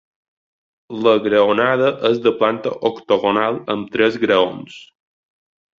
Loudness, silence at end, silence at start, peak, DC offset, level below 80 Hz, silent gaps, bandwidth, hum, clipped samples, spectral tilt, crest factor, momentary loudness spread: -17 LUFS; 0.95 s; 0.9 s; -2 dBFS; under 0.1%; -60 dBFS; none; 7.4 kHz; none; under 0.1%; -6.5 dB/octave; 16 dB; 8 LU